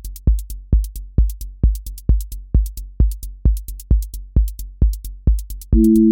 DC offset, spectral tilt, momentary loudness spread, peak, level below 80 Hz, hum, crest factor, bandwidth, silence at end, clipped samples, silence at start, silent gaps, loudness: under 0.1%; -9 dB/octave; 5 LU; -4 dBFS; -18 dBFS; none; 14 dB; 17 kHz; 0 s; under 0.1%; 0.05 s; none; -21 LUFS